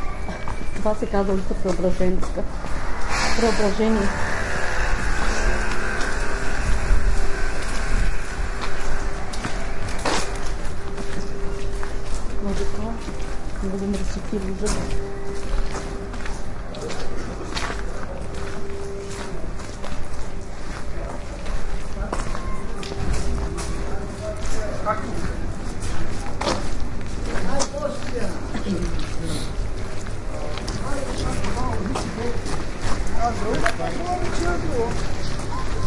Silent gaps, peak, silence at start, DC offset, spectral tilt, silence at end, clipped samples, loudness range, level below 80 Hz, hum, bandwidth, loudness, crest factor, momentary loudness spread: none; 0 dBFS; 0 s; under 0.1%; -5 dB/octave; 0 s; under 0.1%; 8 LU; -28 dBFS; none; 11.5 kHz; -27 LUFS; 20 dB; 9 LU